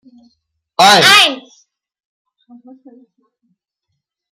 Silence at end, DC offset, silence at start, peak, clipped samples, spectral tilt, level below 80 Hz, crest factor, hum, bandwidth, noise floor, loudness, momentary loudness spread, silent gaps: 2.95 s; under 0.1%; 0.8 s; 0 dBFS; under 0.1%; -1.5 dB/octave; -64 dBFS; 16 dB; none; 16.5 kHz; -74 dBFS; -7 LUFS; 21 LU; none